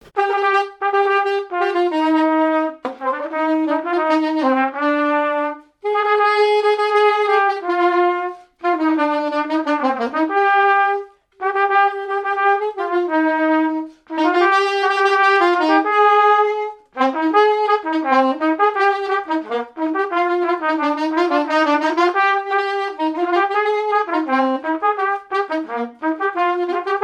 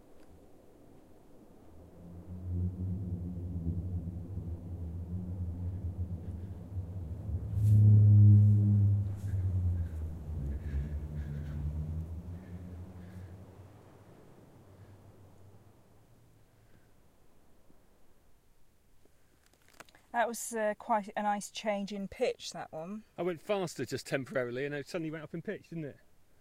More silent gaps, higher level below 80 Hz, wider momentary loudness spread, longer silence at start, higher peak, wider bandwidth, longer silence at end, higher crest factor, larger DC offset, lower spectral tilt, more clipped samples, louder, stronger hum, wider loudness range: neither; second, -70 dBFS vs -48 dBFS; second, 8 LU vs 20 LU; about the same, 0.15 s vs 0.1 s; first, -2 dBFS vs -14 dBFS; second, 9.8 kHz vs 12 kHz; second, 0 s vs 0.45 s; about the same, 16 dB vs 20 dB; neither; second, -3 dB/octave vs -7 dB/octave; neither; first, -17 LUFS vs -32 LUFS; neither; second, 4 LU vs 17 LU